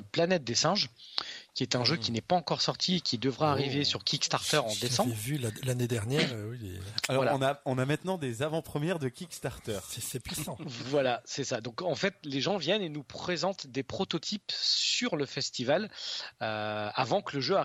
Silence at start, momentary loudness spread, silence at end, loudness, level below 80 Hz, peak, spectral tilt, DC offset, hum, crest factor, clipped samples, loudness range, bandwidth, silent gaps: 0 s; 9 LU; 0 s; -31 LUFS; -64 dBFS; -8 dBFS; -4 dB/octave; under 0.1%; none; 22 dB; under 0.1%; 5 LU; 15.5 kHz; none